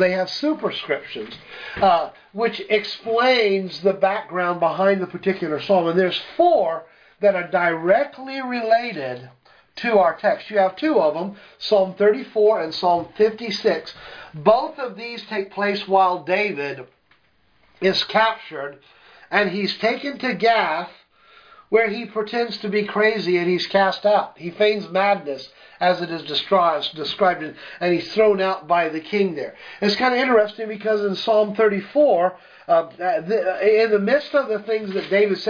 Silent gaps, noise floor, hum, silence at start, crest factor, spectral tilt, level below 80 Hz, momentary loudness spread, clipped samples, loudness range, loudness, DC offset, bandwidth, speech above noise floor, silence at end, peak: none; -62 dBFS; none; 0 s; 18 dB; -6 dB/octave; -64 dBFS; 11 LU; under 0.1%; 3 LU; -20 LUFS; under 0.1%; 5.4 kHz; 41 dB; 0 s; -2 dBFS